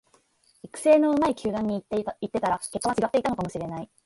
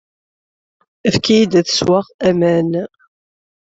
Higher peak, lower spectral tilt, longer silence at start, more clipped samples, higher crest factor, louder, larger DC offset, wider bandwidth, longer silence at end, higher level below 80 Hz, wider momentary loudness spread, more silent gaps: second, -8 dBFS vs -2 dBFS; about the same, -5.5 dB/octave vs -5 dB/octave; second, 0.65 s vs 1.05 s; neither; about the same, 18 dB vs 16 dB; second, -25 LUFS vs -15 LUFS; neither; first, 11.5 kHz vs 8 kHz; second, 0.2 s vs 0.85 s; second, -58 dBFS vs -52 dBFS; first, 12 LU vs 9 LU; second, none vs 2.14-2.19 s